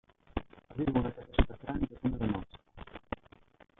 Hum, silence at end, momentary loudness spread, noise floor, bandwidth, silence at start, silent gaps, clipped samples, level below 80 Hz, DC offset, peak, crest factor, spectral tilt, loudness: none; 0.65 s; 18 LU; -60 dBFS; 4 kHz; 0.35 s; none; under 0.1%; -40 dBFS; under 0.1%; -14 dBFS; 22 dB; -10.5 dB/octave; -36 LUFS